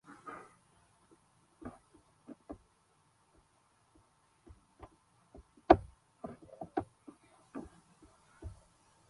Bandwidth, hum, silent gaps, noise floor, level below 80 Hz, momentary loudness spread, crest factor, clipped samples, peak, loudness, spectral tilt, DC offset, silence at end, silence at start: 11.5 kHz; none; none; -71 dBFS; -58 dBFS; 31 LU; 34 dB; under 0.1%; -6 dBFS; -35 LUFS; -7.5 dB/octave; under 0.1%; 0.55 s; 0.1 s